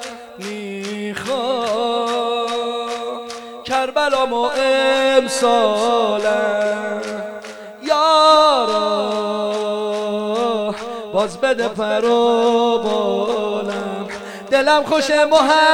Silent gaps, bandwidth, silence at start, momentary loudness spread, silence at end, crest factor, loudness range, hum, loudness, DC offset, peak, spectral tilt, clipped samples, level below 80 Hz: none; 16.5 kHz; 0 s; 14 LU; 0 s; 18 dB; 4 LU; none; -17 LUFS; under 0.1%; 0 dBFS; -3 dB/octave; under 0.1%; -60 dBFS